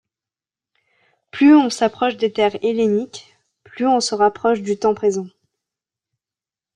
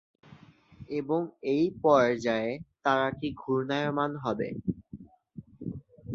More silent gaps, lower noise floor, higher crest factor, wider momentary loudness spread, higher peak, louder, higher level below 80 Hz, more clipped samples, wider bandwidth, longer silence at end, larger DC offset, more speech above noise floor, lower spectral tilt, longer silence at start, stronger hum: neither; first, under -90 dBFS vs -55 dBFS; about the same, 16 dB vs 20 dB; second, 16 LU vs 21 LU; first, -4 dBFS vs -10 dBFS; first, -18 LUFS vs -29 LUFS; second, -66 dBFS vs -60 dBFS; neither; first, 10.5 kHz vs 7.6 kHz; first, 1.5 s vs 0 s; neither; first, over 73 dB vs 27 dB; second, -4.5 dB/octave vs -6.5 dB/octave; first, 1.35 s vs 0.3 s; neither